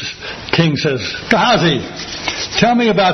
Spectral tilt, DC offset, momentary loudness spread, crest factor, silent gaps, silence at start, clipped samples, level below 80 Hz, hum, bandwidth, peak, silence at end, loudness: -4.5 dB/octave; under 0.1%; 11 LU; 16 dB; none; 0 s; under 0.1%; -44 dBFS; none; 6.4 kHz; 0 dBFS; 0 s; -15 LUFS